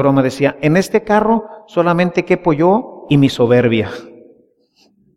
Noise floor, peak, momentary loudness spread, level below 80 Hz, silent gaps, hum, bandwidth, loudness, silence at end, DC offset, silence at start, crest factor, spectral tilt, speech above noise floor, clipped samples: -56 dBFS; 0 dBFS; 6 LU; -48 dBFS; none; none; 13.5 kHz; -14 LUFS; 1.05 s; under 0.1%; 0 s; 14 dB; -7 dB/octave; 42 dB; under 0.1%